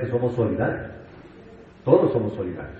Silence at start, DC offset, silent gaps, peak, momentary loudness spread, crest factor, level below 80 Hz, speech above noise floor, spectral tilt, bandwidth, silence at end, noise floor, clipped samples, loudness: 0 s; under 0.1%; none; -2 dBFS; 16 LU; 22 dB; -50 dBFS; 23 dB; -10 dB/octave; 4.7 kHz; 0 s; -46 dBFS; under 0.1%; -23 LUFS